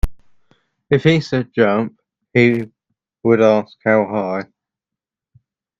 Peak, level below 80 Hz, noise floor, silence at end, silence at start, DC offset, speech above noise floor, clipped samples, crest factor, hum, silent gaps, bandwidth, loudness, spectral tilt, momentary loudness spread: 0 dBFS; -34 dBFS; -86 dBFS; 1.35 s; 0.05 s; under 0.1%; 71 dB; under 0.1%; 18 dB; none; none; 12.5 kHz; -17 LUFS; -7.5 dB/octave; 13 LU